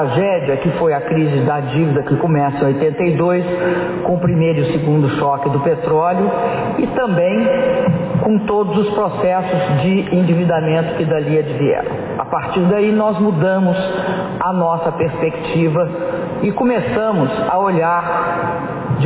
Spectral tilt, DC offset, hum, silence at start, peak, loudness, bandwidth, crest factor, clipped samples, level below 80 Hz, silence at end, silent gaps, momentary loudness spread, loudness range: -11.5 dB/octave; under 0.1%; none; 0 s; -2 dBFS; -16 LUFS; 4 kHz; 12 dB; under 0.1%; -46 dBFS; 0 s; none; 4 LU; 1 LU